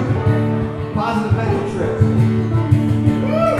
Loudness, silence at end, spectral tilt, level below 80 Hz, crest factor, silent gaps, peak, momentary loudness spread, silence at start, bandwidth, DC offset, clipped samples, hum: -17 LUFS; 0 s; -8.5 dB/octave; -38 dBFS; 16 dB; none; 0 dBFS; 5 LU; 0 s; 10.5 kHz; under 0.1%; under 0.1%; none